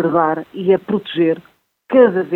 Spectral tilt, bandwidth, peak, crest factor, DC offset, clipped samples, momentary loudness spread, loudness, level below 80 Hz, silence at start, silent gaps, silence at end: -9 dB/octave; 4.2 kHz; 0 dBFS; 16 dB; under 0.1%; under 0.1%; 8 LU; -16 LUFS; -62 dBFS; 0 s; none; 0 s